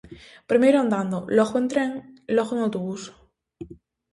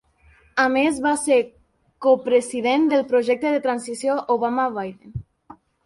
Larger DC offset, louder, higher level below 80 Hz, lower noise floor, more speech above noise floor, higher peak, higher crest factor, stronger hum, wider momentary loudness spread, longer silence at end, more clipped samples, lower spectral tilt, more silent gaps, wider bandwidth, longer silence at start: neither; about the same, -23 LUFS vs -21 LUFS; about the same, -60 dBFS vs -56 dBFS; second, -44 dBFS vs -55 dBFS; second, 22 dB vs 35 dB; about the same, -6 dBFS vs -6 dBFS; about the same, 18 dB vs 16 dB; neither; first, 24 LU vs 13 LU; about the same, 0.4 s vs 0.3 s; neither; first, -6 dB/octave vs -4.5 dB/octave; neither; about the same, 11.5 kHz vs 11.5 kHz; second, 0.1 s vs 0.55 s